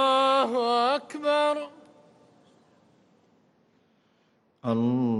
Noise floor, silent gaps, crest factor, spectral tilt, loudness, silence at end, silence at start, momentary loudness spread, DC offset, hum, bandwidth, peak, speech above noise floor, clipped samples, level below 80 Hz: -67 dBFS; none; 16 dB; -5.5 dB/octave; -25 LUFS; 0 s; 0 s; 11 LU; under 0.1%; none; 11.5 kHz; -12 dBFS; 41 dB; under 0.1%; -80 dBFS